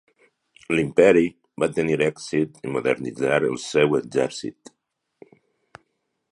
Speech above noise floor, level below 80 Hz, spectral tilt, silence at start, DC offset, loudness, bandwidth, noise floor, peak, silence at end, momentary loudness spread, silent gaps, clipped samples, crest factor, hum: 52 dB; -58 dBFS; -5.5 dB/octave; 0.7 s; under 0.1%; -22 LUFS; 11.5 kHz; -74 dBFS; -2 dBFS; 1.8 s; 10 LU; none; under 0.1%; 20 dB; none